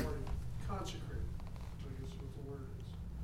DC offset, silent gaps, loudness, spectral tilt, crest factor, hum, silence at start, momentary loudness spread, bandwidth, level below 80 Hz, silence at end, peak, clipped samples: under 0.1%; none; -46 LUFS; -6.5 dB/octave; 18 dB; none; 0 s; 5 LU; 16 kHz; -46 dBFS; 0 s; -24 dBFS; under 0.1%